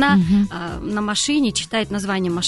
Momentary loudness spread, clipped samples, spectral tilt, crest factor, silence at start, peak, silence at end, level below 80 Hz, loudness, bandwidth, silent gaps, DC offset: 8 LU; under 0.1%; -4.5 dB/octave; 14 dB; 0 s; -4 dBFS; 0 s; -42 dBFS; -20 LUFS; 11.5 kHz; none; under 0.1%